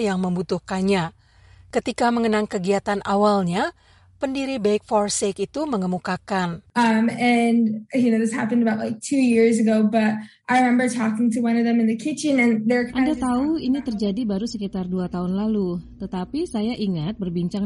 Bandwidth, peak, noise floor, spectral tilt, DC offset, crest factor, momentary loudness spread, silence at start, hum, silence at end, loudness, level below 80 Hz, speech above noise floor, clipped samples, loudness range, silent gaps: 11.5 kHz; -8 dBFS; -50 dBFS; -5.5 dB/octave; under 0.1%; 14 dB; 8 LU; 0 s; none; 0 s; -22 LUFS; -52 dBFS; 29 dB; under 0.1%; 5 LU; none